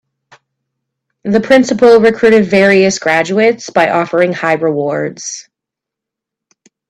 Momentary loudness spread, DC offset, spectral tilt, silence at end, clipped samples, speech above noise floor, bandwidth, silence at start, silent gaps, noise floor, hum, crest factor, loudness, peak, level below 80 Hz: 12 LU; under 0.1%; -5 dB/octave; 1.5 s; under 0.1%; 72 dB; 10.5 kHz; 1.25 s; none; -82 dBFS; none; 12 dB; -11 LUFS; 0 dBFS; -52 dBFS